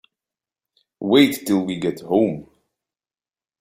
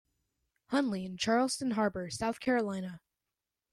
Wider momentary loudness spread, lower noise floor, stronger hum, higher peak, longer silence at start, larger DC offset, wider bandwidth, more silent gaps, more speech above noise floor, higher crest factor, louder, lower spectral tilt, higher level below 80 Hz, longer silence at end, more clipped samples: first, 12 LU vs 7 LU; about the same, under -90 dBFS vs -89 dBFS; neither; first, -2 dBFS vs -18 dBFS; first, 1 s vs 0.7 s; neither; first, 16.5 kHz vs 13.5 kHz; neither; first, over 71 dB vs 57 dB; about the same, 20 dB vs 16 dB; first, -19 LUFS vs -32 LUFS; about the same, -5.5 dB/octave vs -4.5 dB/octave; about the same, -62 dBFS vs -66 dBFS; first, 1.2 s vs 0.75 s; neither